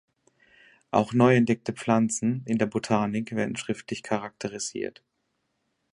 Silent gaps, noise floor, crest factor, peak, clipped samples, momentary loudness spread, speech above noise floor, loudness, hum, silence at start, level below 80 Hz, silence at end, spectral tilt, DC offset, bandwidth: none; -76 dBFS; 22 dB; -6 dBFS; under 0.1%; 12 LU; 51 dB; -26 LUFS; none; 0.95 s; -64 dBFS; 1.05 s; -5.5 dB/octave; under 0.1%; 11 kHz